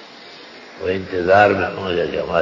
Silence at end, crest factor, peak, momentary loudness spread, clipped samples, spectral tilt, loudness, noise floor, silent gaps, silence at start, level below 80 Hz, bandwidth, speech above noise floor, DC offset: 0 s; 18 dB; -2 dBFS; 25 LU; under 0.1%; -6.5 dB/octave; -18 LUFS; -40 dBFS; none; 0 s; -44 dBFS; 7.6 kHz; 23 dB; under 0.1%